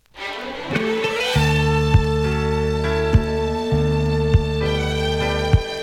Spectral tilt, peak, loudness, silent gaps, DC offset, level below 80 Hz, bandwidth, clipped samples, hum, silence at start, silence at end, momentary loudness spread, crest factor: -6 dB/octave; -2 dBFS; -20 LUFS; none; under 0.1%; -28 dBFS; 15 kHz; under 0.1%; none; 0.15 s; 0 s; 5 LU; 18 dB